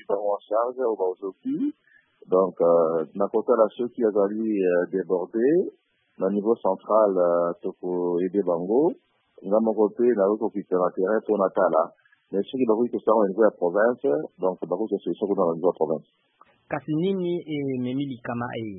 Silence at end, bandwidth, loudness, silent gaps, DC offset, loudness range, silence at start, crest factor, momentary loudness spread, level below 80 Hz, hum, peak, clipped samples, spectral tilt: 0 s; 4 kHz; -24 LUFS; none; under 0.1%; 4 LU; 0.1 s; 18 dB; 9 LU; -74 dBFS; none; -6 dBFS; under 0.1%; -11.5 dB/octave